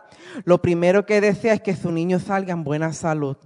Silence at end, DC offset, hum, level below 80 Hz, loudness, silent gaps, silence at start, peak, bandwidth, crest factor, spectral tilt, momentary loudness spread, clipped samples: 0.1 s; under 0.1%; none; -58 dBFS; -20 LUFS; none; 0.2 s; -2 dBFS; 11 kHz; 18 dB; -7 dB/octave; 7 LU; under 0.1%